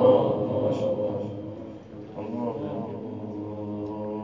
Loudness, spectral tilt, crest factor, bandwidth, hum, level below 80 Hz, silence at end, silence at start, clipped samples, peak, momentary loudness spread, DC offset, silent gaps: -29 LUFS; -9 dB/octave; 20 dB; 7.4 kHz; none; -58 dBFS; 0 s; 0 s; under 0.1%; -8 dBFS; 13 LU; under 0.1%; none